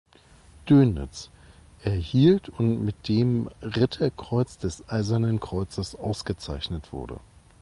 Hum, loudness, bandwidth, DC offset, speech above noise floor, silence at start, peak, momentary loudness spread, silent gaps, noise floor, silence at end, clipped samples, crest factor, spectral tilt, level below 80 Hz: none; -25 LUFS; 11.5 kHz; under 0.1%; 29 dB; 0.65 s; -8 dBFS; 18 LU; none; -54 dBFS; 0.45 s; under 0.1%; 18 dB; -7.5 dB/octave; -44 dBFS